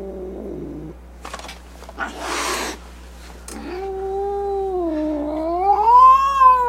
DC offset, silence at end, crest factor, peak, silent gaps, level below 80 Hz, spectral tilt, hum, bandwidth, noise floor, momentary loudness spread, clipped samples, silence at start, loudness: under 0.1%; 0 s; 18 dB; -2 dBFS; none; -40 dBFS; -4 dB/octave; none; 15.5 kHz; -38 dBFS; 25 LU; under 0.1%; 0 s; -18 LUFS